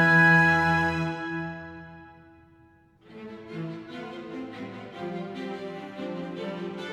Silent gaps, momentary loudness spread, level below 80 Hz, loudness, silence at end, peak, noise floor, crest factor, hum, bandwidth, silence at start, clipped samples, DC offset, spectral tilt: none; 23 LU; -56 dBFS; -26 LUFS; 0 s; -8 dBFS; -58 dBFS; 20 dB; none; 11 kHz; 0 s; under 0.1%; under 0.1%; -6.5 dB/octave